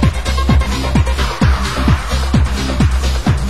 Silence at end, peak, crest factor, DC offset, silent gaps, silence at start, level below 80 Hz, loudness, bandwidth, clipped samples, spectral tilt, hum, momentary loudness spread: 0 s; 0 dBFS; 14 dB; 3%; none; 0 s; -16 dBFS; -15 LUFS; 12.5 kHz; under 0.1%; -5.5 dB/octave; none; 2 LU